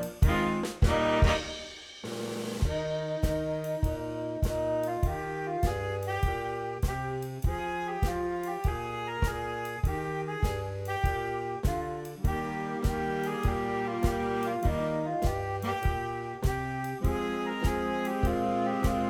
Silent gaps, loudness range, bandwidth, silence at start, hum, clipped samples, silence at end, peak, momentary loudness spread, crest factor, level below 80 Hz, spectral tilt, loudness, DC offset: none; 2 LU; 18 kHz; 0 s; none; under 0.1%; 0 s; -10 dBFS; 7 LU; 20 dB; -36 dBFS; -6 dB/octave; -31 LUFS; under 0.1%